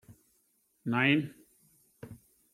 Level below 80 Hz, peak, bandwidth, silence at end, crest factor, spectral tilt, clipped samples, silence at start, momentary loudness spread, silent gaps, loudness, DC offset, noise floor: -72 dBFS; -12 dBFS; 15 kHz; 0.4 s; 24 dB; -6.5 dB/octave; under 0.1%; 0.1 s; 25 LU; none; -29 LUFS; under 0.1%; -73 dBFS